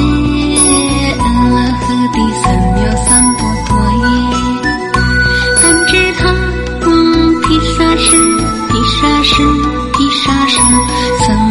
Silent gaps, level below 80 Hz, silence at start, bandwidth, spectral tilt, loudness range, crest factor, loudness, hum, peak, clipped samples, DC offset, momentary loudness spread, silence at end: none; -20 dBFS; 0 s; over 20 kHz; -3.5 dB/octave; 2 LU; 10 dB; -10 LUFS; none; 0 dBFS; 0.2%; under 0.1%; 6 LU; 0 s